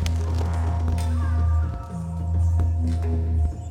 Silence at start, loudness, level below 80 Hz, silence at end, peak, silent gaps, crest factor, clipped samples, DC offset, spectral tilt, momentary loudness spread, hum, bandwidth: 0 s; -24 LUFS; -26 dBFS; 0 s; -12 dBFS; none; 10 dB; under 0.1%; under 0.1%; -7.5 dB/octave; 6 LU; none; 9.6 kHz